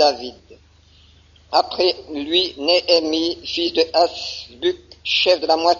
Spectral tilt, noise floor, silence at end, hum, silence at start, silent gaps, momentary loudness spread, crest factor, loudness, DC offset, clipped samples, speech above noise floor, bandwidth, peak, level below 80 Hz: 0 dB/octave; -51 dBFS; 0 s; none; 0 s; none; 12 LU; 18 dB; -19 LUFS; under 0.1%; under 0.1%; 32 dB; 7.4 kHz; -2 dBFS; -54 dBFS